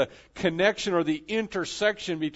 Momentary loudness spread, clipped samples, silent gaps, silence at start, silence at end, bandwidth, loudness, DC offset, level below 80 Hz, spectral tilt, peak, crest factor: 7 LU; under 0.1%; none; 0 s; 0 s; 8 kHz; -27 LUFS; under 0.1%; -58 dBFS; -4.5 dB/octave; -8 dBFS; 18 dB